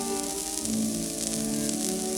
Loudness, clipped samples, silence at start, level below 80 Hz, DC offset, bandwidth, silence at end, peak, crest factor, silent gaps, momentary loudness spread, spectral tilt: -28 LUFS; under 0.1%; 0 s; -52 dBFS; under 0.1%; 19.5 kHz; 0 s; -6 dBFS; 24 dB; none; 2 LU; -3 dB/octave